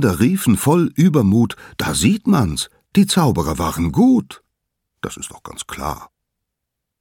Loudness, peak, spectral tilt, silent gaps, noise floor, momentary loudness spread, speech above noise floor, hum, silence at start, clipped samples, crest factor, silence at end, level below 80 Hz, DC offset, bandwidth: -17 LUFS; 0 dBFS; -5.5 dB/octave; none; -79 dBFS; 16 LU; 63 dB; none; 0 s; under 0.1%; 16 dB; 0.95 s; -40 dBFS; under 0.1%; 17.5 kHz